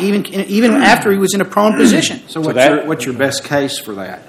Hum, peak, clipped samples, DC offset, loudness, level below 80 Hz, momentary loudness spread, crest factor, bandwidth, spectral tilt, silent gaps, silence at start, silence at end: none; 0 dBFS; 0.3%; under 0.1%; -13 LUFS; -52 dBFS; 10 LU; 14 dB; 16 kHz; -4.5 dB/octave; none; 0 s; 0.1 s